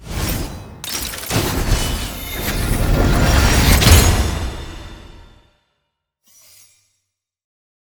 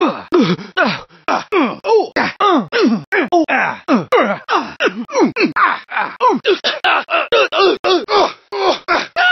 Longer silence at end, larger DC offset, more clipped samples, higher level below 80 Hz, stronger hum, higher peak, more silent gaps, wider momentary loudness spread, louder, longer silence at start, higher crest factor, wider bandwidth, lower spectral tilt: first, 2.6 s vs 0 s; neither; neither; first, -22 dBFS vs -58 dBFS; neither; about the same, 0 dBFS vs 0 dBFS; second, none vs 3.07-3.12 s, 7.79-7.84 s; first, 19 LU vs 5 LU; about the same, -17 LUFS vs -15 LUFS; about the same, 0 s vs 0 s; about the same, 18 dB vs 14 dB; first, over 20 kHz vs 6.6 kHz; about the same, -4 dB/octave vs -4.5 dB/octave